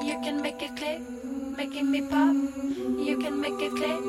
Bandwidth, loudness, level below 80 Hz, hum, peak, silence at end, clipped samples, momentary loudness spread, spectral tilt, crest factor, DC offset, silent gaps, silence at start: 14 kHz; -29 LUFS; -58 dBFS; none; -12 dBFS; 0 s; under 0.1%; 10 LU; -4 dB/octave; 16 dB; under 0.1%; none; 0 s